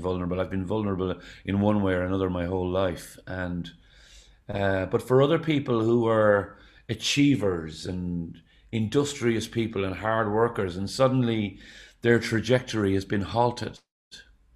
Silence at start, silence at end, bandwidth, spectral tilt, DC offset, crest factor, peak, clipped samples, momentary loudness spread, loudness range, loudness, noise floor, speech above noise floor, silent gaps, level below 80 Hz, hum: 0 s; 0.35 s; 14.5 kHz; -6 dB/octave; under 0.1%; 20 dB; -6 dBFS; under 0.1%; 12 LU; 4 LU; -26 LUFS; -53 dBFS; 28 dB; 13.91-14.11 s; -52 dBFS; none